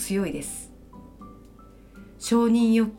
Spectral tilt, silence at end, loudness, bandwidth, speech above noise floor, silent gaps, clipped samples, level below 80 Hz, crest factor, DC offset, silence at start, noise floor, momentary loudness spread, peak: -5 dB/octave; 0 s; -24 LUFS; 16.5 kHz; 26 dB; none; under 0.1%; -52 dBFS; 16 dB; under 0.1%; 0 s; -49 dBFS; 26 LU; -10 dBFS